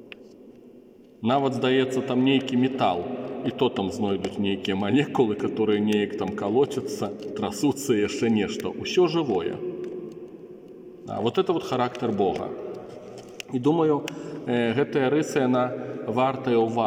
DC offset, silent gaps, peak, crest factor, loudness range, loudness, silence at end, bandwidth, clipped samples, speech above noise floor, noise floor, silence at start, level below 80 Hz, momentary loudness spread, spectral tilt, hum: under 0.1%; none; -8 dBFS; 18 dB; 4 LU; -25 LUFS; 0 s; 16.5 kHz; under 0.1%; 26 dB; -50 dBFS; 0 s; -66 dBFS; 15 LU; -6 dB/octave; none